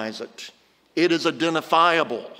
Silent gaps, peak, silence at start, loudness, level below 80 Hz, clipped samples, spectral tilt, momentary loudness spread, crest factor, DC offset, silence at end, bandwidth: none; -4 dBFS; 0 s; -21 LUFS; -78 dBFS; under 0.1%; -4 dB/octave; 19 LU; 18 dB; under 0.1%; 0.05 s; 16 kHz